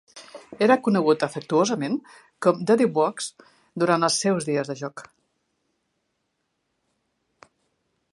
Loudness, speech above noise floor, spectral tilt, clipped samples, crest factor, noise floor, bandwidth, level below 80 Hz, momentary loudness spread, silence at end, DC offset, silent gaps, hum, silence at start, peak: -23 LUFS; 53 dB; -4.5 dB/octave; under 0.1%; 22 dB; -76 dBFS; 11.5 kHz; -74 dBFS; 17 LU; 3.1 s; under 0.1%; none; none; 0.15 s; -4 dBFS